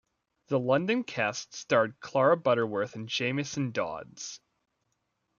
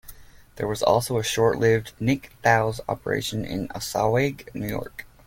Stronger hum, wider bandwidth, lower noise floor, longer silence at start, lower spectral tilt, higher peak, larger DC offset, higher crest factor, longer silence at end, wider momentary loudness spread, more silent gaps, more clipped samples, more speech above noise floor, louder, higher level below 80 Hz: neither; second, 7.4 kHz vs 17 kHz; first, -79 dBFS vs -45 dBFS; first, 0.5 s vs 0.05 s; about the same, -5 dB/octave vs -5 dB/octave; second, -10 dBFS vs -4 dBFS; neither; about the same, 20 dB vs 20 dB; first, 1 s vs 0.2 s; first, 14 LU vs 10 LU; neither; neither; first, 50 dB vs 22 dB; second, -29 LUFS vs -24 LUFS; second, -74 dBFS vs -48 dBFS